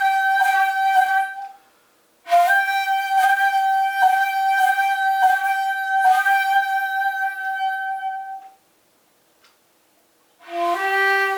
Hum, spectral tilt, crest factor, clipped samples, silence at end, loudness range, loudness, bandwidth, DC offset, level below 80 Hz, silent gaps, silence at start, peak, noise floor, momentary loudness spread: none; 0.5 dB/octave; 14 dB; under 0.1%; 0 s; 10 LU; -19 LUFS; over 20 kHz; under 0.1%; -74 dBFS; none; 0 s; -6 dBFS; -60 dBFS; 10 LU